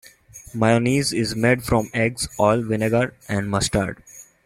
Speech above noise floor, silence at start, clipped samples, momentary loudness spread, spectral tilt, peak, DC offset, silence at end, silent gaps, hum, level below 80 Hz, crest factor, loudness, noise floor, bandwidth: 24 dB; 0.35 s; under 0.1%; 7 LU; -5 dB/octave; -2 dBFS; under 0.1%; 0.25 s; none; none; -44 dBFS; 18 dB; -21 LUFS; -45 dBFS; 16 kHz